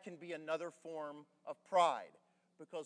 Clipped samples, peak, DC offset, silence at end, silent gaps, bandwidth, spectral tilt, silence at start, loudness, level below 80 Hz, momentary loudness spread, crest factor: under 0.1%; -20 dBFS; under 0.1%; 0 s; none; 10.5 kHz; -4 dB/octave; 0 s; -39 LUFS; under -90 dBFS; 18 LU; 22 dB